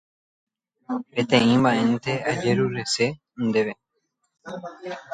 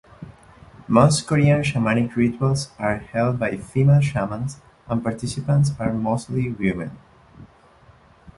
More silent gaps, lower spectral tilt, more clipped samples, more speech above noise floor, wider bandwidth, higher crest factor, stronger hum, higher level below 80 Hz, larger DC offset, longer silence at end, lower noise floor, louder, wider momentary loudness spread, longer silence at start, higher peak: neither; second, -5 dB/octave vs -6.5 dB/octave; neither; first, 52 dB vs 31 dB; second, 9.4 kHz vs 11.5 kHz; about the same, 20 dB vs 20 dB; neither; second, -60 dBFS vs -46 dBFS; neither; second, 0 s vs 0.9 s; first, -75 dBFS vs -52 dBFS; about the same, -23 LUFS vs -21 LUFS; first, 18 LU vs 10 LU; first, 0.9 s vs 0.2 s; second, -4 dBFS vs 0 dBFS